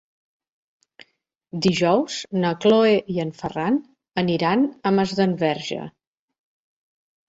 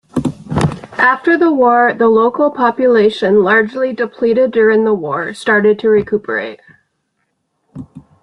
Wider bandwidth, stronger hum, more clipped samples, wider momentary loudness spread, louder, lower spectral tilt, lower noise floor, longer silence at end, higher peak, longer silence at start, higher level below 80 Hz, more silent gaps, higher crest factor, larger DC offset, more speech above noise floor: second, 8 kHz vs 11.5 kHz; neither; neither; about the same, 12 LU vs 10 LU; second, -21 LUFS vs -13 LUFS; about the same, -6 dB/octave vs -7 dB/octave; about the same, -68 dBFS vs -67 dBFS; first, 1.4 s vs 0.25 s; second, -6 dBFS vs 0 dBFS; first, 1.55 s vs 0.15 s; second, -60 dBFS vs -48 dBFS; neither; about the same, 18 dB vs 14 dB; neither; second, 47 dB vs 55 dB